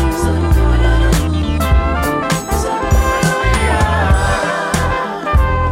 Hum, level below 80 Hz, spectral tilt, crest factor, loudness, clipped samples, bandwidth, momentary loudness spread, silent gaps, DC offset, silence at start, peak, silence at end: none; -18 dBFS; -5.5 dB/octave; 12 dB; -15 LUFS; under 0.1%; 16.5 kHz; 4 LU; none; under 0.1%; 0 s; -2 dBFS; 0 s